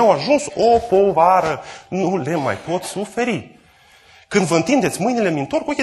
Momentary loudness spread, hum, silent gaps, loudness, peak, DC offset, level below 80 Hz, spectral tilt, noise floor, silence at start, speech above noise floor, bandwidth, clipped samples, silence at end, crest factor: 10 LU; none; none; -18 LUFS; -2 dBFS; under 0.1%; -50 dBFS; -5 dB/octave; -50 dBFS; 0 s; 33 dB; 12.5 kHz; under 0.1%; 0 s; 16 dB